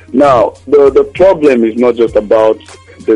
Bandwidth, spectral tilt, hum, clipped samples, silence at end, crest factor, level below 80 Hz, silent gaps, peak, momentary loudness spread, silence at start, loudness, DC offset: 10.5 kHz; -7 dB/octave; none; under 0.1%; 0 s; 8 dB; -38 dBFS; none; 0 dBFS; 5 LU; 0.1 s; -9 LUFS; under 0.1%